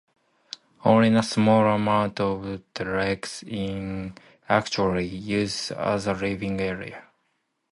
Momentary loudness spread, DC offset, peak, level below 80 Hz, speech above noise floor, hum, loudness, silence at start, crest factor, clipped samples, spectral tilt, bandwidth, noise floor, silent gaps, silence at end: 16 LU; under 0.1%; -4 dBFS; -52 dBFS; 50 dB; none; -24 LUFS; 0.85 s; 20 dB; under 0.1%; -5.5 dB/octave; 11.5 kHz; -73 dBFS; none; 0.75 s